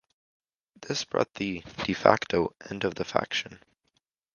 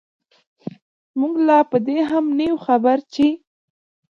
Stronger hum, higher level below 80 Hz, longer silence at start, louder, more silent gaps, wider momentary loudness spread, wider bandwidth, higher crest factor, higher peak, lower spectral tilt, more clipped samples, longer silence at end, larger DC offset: neither; about the same, -58 dBFS vs -62 dBFS; second, 0.8 s vs 1.15 s; second, -28 LUFS vs -18 LUFS; neither; second, 11 LU vs 21 LU; first, 10 kHz vs 7.2 kHz; first, 30 dB vs 16 dB; first, 0 dBFS vs -4 dBFS; second, -4.5 dB/octave vs -7 dB/octave; neither; about the same, 0.8 s vs 0.8 s; neither